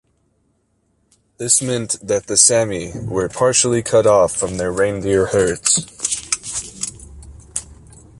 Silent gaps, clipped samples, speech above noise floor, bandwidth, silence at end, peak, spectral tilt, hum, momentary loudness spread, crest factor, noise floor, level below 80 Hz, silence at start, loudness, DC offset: none; under 0.1%; 47 dB; 11.5 kHz; 0.45 s; 0 dBFS; -3 dB/octave; none; 15 LU; 18 dB; -64 dBFS; -44 dBFS; 1.4 s; -17 LUFS; under 0.1%